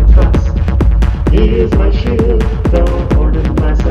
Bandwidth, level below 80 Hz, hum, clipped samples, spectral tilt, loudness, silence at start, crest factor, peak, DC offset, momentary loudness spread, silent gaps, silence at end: 6.4 kHz; -10 dBFS; none; 0.2%; -8.5 dB/octave; -12 LUFS; 0 s; 10 dB; 0 dBFS; 0.9%; 3 LU; none; 0 s